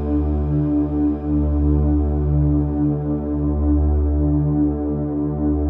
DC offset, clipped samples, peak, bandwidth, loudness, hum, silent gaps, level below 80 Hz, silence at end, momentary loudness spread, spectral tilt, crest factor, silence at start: under 0.1%; under 0.1%; -6 dBFS; 2.5 kHz; -20 LUFS; none; none; -24 dBFS; 0 s; 4 LU; -13.5 dB/octave; 12 dB; 0 s